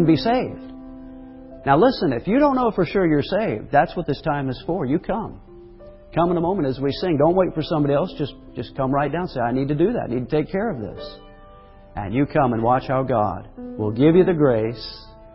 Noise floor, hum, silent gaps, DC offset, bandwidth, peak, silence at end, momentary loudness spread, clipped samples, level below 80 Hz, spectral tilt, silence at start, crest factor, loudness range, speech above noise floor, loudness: -45 dBFS; none; none; under 0.1%; 5.8 kHz; -4 dBFS; 0.2 s; 18 LU; under 0.1%; -44 dBFS; -11.5 dB/octave; 0 s; 18 dB; 4 LU; 25 dB; -21 LUFS